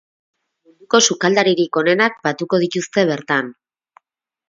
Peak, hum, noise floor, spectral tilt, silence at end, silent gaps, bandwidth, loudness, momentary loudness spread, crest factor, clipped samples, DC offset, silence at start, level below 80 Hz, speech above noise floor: 0 dBFS; none; -62 dBFS; -3.5 dB/octave; 0.95 s; none; 7.6 kHz; -17 LUFS; 6 LU; 18 dB; under 0.1%; under 0.1%; 0.9 s; -66 dBFS; 45 dB